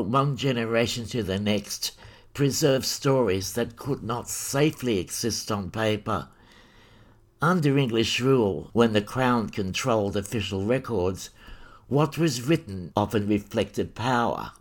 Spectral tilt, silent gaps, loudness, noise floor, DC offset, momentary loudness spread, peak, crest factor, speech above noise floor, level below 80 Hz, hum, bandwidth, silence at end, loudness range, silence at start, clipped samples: -5 dB/octave; none; -25 LUFS; -55 dBFS; under 0.1%; 8 LU; -6 dBFS; 20 dB; 30 dB; -54 dBFS; none; 19 kHz; 0.1 s; 4 LU; 0 s; under 0.1%